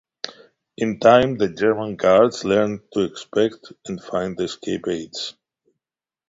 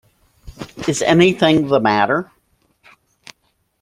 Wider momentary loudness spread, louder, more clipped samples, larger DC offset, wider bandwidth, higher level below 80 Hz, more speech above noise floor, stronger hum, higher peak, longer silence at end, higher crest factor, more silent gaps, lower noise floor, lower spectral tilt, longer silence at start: second, 18 LU vs 22 LU; second, -20 LUFS vs -15 LUFS; neither; neither; second, 7.8 kHz vs 14 kHz; second, -56 dBFS vs -50 dBFS; first, over 70 dB vs 50 dB; neither; about the same, -2 dBFS vs 0 dBFS; second, 1 s vs 1.6 s; about the same, 20 dB vs 18 dB; neither; first, under -90 dBFS vs -64 dBFS; about the same, -5.5 dB/octave vs -5 dB/octave; second, 0.25 s vs 0.45 s